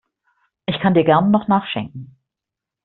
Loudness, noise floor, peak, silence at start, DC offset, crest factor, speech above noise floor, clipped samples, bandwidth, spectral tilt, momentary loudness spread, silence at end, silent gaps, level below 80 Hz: -17 LUFS; -85 dBFS; -2 dBFS; 0.7 s; under 0.1%; 18 dB; 69 dB; under 0.1%; 4.2 kHz; -5.5 dB/octave; 17 LU; 0.8 s; none; -56 dBFS